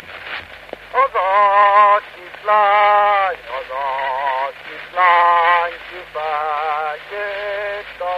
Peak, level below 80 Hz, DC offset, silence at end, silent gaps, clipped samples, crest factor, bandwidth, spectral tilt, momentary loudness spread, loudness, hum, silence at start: -2 dBFS; -56 dBFS; under 0.1%; 0 s; none; under 0.1%; 16 dB; 7.2 kHz; -3 dB/octave; 17 LU; -16 LUFS; none; 0 s